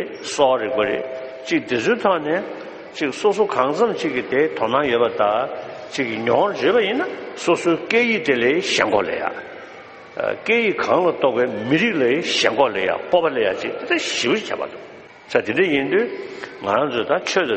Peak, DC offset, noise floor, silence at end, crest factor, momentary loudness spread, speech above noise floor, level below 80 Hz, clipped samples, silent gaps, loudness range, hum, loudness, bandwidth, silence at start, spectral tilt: 0 dBFS; under 0.1%; -40 dBFS; 0 s; 20 dB; 11 LU; 20 dB; -60 dBFS; under 0.1%; none; 3 LU; none; -20 LUFS; 8.8 kHz; 0 s; -4 dB/octave